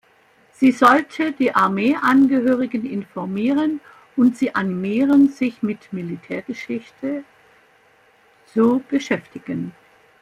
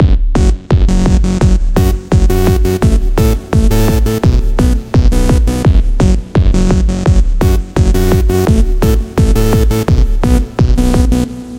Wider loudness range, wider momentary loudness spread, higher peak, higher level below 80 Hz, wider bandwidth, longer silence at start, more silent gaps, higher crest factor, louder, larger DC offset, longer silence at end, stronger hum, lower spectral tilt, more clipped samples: first, 7 LU vs 0 LU; first, 14 LU vs 2 LU; about the same, -2 dBFS vs 0 dBFS; second, -62 dBFS vs -12 dBFS; second, 11.5 kHz vs 16.5 kHz; first, 0.6 s vs 0 s; neither; first, 18 dB vs 10 dB; second, -19 LUFS vs -12 LUFS; neither; first, 0.5 s vs 0 s; neither; about the same, -6.5 dB/octave vs -7 dB/octave; neither